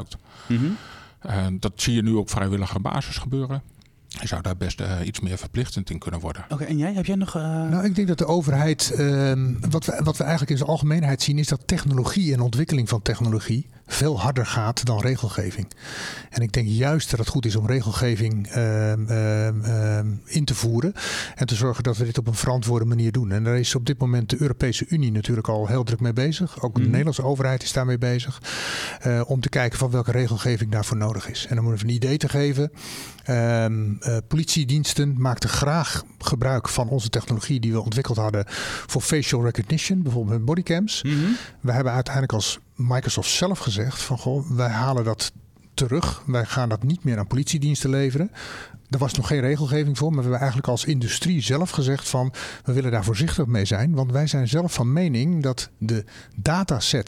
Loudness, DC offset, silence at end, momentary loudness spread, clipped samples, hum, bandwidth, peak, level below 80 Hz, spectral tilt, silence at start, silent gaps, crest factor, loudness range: -23 LUFS; under 0.1%; 0 s; 7 LU; under 0.1%; none; 15 kHz; -2 dBFS; -44 dBFS; -5.5 dB/octave; 0 s; none; 20 dB; 3 LU